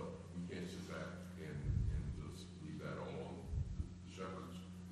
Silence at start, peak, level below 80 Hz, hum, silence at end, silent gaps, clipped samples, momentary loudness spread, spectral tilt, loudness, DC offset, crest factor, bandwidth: 0 s; -28 dBFS; -50 dBFS; none; 0 s; none; under 0.1%; 9 LU; -7 dB/octave; -47 LUFS; under 0.1%; 18 dB; 12.5 kHz